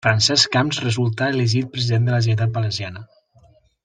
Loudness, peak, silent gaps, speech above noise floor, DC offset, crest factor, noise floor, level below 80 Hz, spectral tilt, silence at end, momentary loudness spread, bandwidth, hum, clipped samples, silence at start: -19 LUFS; -2 dBFS; none; 35 dB; under 0.1%; 18 dB; -54 dBFS; -56 dBFS; -4.5 dB/octave; 0.8 s; 10 LU; 9.4 kHz; none; under 0.1%; 0.05 s